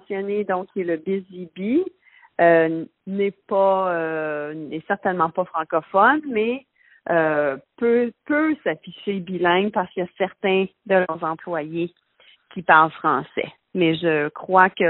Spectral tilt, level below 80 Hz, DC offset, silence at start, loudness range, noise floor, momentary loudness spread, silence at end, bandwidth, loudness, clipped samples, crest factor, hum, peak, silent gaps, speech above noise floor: -4 dB/octave; -66 dBFS; under 0.1%; 0.1 s; 2 LU; -56 dBFS; 13 LU; 0 s; 4.2 kHz; -22 LUFS; under 0.1%; 22 dB; none; 0 dBFS; none; 35 dB